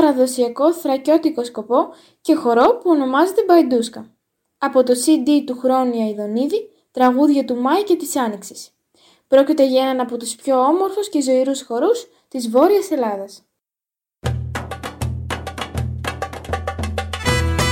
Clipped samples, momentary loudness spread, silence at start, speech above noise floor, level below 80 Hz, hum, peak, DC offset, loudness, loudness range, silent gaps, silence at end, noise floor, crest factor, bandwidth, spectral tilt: under 0.1%; 13 LU; 0 s; 72 dB; -38 dBFS; none; -2 dBFS; under 0.1%; -18 LUFS; 9 LU; none; 0 s; -89 dBFS; 16 dB; 17 kHz; -5.5 dB/octave